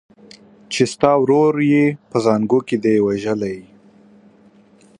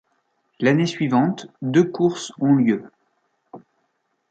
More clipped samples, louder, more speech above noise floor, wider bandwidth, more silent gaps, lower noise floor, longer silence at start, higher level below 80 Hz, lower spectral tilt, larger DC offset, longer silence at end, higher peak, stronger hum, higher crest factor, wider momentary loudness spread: neither; first, -17 LUFS vs -20 LUFS; second, 34 dB vs 52 dB; first, 11.5 kHz vs 9 kHz; neither; second, -50 dBFS vs -71 dBFS; about the same, 0.7 s vs 0.6 s; first, -58 dBFS vs -66 dBFS; about the same, -6 dB/octave vs -6.5 dB/octave; neither; first, 1.4 s vs 0.75 s; first, 0 dBFS vs -4 dBFS; neither; about the same, 18 dB vs 18 dB; first, 9 LU vs 6 LU